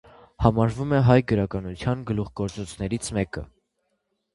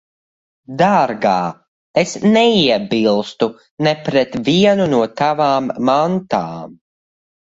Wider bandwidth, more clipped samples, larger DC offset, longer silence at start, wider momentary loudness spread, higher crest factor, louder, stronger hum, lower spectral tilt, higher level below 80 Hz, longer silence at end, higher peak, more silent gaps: first, 11.5 kHz vs 8 kHz; neither; neither; second, 0.4 s vs 0.7 s; first, 12 LU vs 8 LU; first, 24 dB vs 16 dB; second, -24 LUFS vs -16 LUFS; neither; first, -7 dB/octave vs -5.5 dB/octave; first, -42 dBFS vs -54 dBFS; about the same, 0.9 s vs 0.8 s; about the same, 0 dBFS vs 0 dBFS; second, none vs 1.68-1.94 s, 3.71-3.77 s